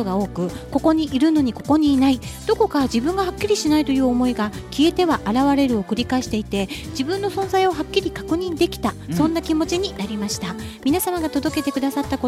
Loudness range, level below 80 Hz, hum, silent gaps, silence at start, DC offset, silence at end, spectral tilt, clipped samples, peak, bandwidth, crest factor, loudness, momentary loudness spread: 3 LU; -40 dBFS; none; none; 0 s; under 0.1%; 0 s; -5 dB/octave; under 0.1%; -4 dBFS; 15.5 kHz; 16 dB; -21 LUFS; 8 LU